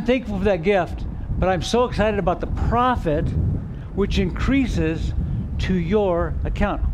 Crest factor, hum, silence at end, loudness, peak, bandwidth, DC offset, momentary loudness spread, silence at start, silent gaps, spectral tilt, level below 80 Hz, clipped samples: 14 dB; none; 0 s; -22 LUFS; -6 dBFS; 11 kHz; under 0.1%; 6 LU; 0 s; none; -7 dB/octave; -28 dBFS; under 0.1%